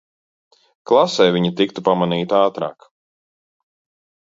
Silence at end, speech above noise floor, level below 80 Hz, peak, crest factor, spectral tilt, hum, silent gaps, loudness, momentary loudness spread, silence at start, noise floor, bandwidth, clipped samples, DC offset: 1.5 s; over 73 dB; -64 dBFS; -2 dBFS; 18 dB; -6 dB/octave; none; none; -17 LUFS; 5 LU; 0.85 s; under -90 dBFS; 7.8 kHz; under 0.1%; under 0.1%